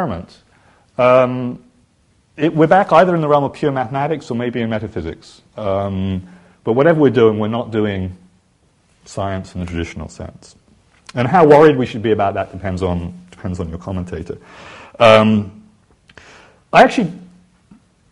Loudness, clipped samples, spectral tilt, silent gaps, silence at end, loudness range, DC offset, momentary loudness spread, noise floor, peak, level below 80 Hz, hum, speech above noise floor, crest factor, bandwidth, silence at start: -15 LUFS; under 0.1%; -7 dB/octave; none; 0.85 s; 7 LU; under 0.1%; 20 LU; -57 dBFS; 0 dBFS; -44 dBFS; none; 42 dB; 16 dB; 11 kHz; 0 s